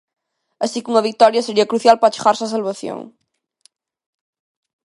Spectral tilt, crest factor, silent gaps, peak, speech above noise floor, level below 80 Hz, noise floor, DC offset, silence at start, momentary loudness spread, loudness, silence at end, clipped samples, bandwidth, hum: -3.5 dB/octave; 18 dB; none; 0 dBFS; 42 dB; -66 dBFS; -58 dBFS; under 0.1%; 0.6 s; 13 LU; -16 LUFS; 1.8 s; under 0.1%; 11.5 kHz; none